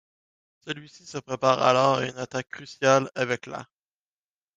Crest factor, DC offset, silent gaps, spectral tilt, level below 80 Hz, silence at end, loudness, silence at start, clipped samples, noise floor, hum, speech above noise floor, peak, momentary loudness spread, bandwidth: 22 dB; under 0.1%; none; -4.5 dB/octave; -68 dBFS; 0.95 s; -24 LUFS; 0.65 s; under 0.1%; under -90 dBFS; none; over 65 dB; -4 dBFS; 18 LU; 9.4 kHz